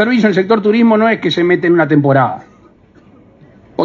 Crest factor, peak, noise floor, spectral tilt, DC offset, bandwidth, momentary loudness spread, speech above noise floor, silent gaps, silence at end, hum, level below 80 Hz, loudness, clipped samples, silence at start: 12 dB; 0 dBFS; -45 dBFS; -7.5 dB/octave; under 0.1%; 7.2 kHz; 6 LU; 34 dB; none; 0 s; none; -56 dBFS; -12 LUFS; under 0.1%; 0 s